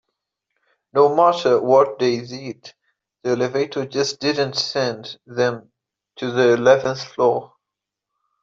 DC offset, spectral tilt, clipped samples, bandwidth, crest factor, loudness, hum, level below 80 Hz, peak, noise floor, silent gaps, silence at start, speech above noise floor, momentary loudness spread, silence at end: under 0.1%; -4.5 dB/octave; under 0.1%; 7.6 kHz; 18 dB; -19 LUFS; none; -66 dBFS; -2 dBFS; -84 dBFS; none; 0.95 s; 65 dB; 15 LU; 0.95 s